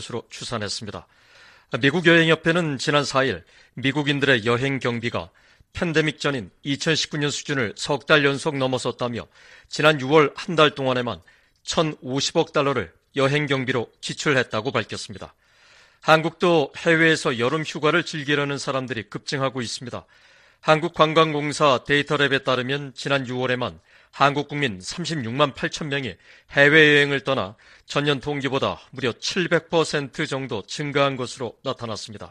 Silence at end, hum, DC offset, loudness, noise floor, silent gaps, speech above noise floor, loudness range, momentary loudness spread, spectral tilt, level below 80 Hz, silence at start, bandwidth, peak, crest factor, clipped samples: 0.05 s; none; under 0.1%; -22 LUFS; -54 dBFS; none; 32 dB; 5 LU; 13 LU; -4.5 dB/octave; -56 dBFS; 0 s; 11 kHz; 0 dBFS; 22 dB; under 0.1%